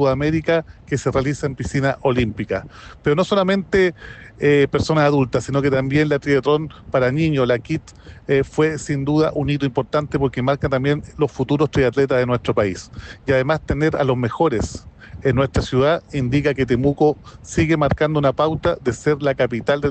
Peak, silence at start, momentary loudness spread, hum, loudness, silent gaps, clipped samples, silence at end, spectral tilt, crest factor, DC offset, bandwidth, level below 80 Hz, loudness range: -6 dBFS; 0 s; 7 LU; none; -19 LUFS; none; under 0.1%; 0 s; -6.5 dB/octave; 12 dB; under 0.1%; 8.8 kHz; -40 dBFS; 2 LU